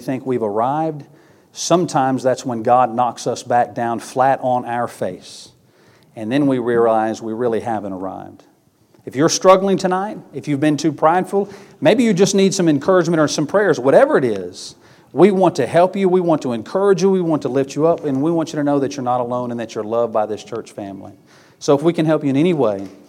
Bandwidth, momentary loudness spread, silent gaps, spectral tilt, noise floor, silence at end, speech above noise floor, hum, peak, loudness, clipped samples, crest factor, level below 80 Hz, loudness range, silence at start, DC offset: 14.5 kHz; 14 LU; none; -5.5 dB/octave; -55 dBFS; 0.15 s; 38 dB; none; 0 dBFS; -17 LUFS; under 0.1%; 18 dB; -66 dBFS; 5 LU; 0 s; under 0.1%